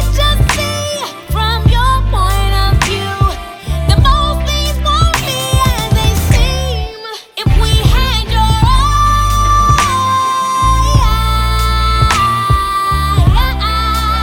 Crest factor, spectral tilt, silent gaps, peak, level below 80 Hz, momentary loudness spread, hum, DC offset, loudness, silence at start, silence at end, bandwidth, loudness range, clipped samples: 12 dB; -4.5 dB/octave; none; 0 dBFS; -14 dBFS; 6 LU; none; under 0.1%; -12 LUFS; 0 s; 0 s; 18.5 kHz; 2 LU; under 0.1%